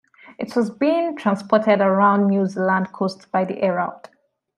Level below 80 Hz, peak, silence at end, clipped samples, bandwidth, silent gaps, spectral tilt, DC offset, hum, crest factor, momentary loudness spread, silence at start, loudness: -70 dBFS; -2 dBFS; 0.6 s; under 0.1%; 10.5 kHz; none; -7.5 dB/octave; under 0.1%; none; 18 dB; 9 LU; 0.3 s; -20 LUFS